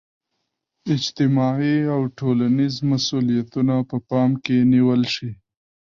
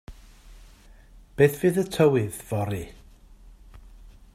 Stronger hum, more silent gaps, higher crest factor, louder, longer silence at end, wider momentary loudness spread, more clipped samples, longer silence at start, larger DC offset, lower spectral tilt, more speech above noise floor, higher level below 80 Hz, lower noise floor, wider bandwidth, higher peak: neither; neither; second, 12 dB vs 22 dB; first, -20 LUFS vs -24 LUFS; first, 0.6 s vs 0.25 s; second, 7 LU vs 16 LU; neither; first, 0.85 s vs 0.1 s; neither; about the same, -6.5 dB/octave vs -6.5 dB/octave; first, 58 dB vs 28 dB; second, -58 dBFS vs -48 dBFS; first, -77 dBFS vs -51 dBFS; second, 7.2 kHz vs 16 kHz; about the same, -8 dBFS vs -6 dBFS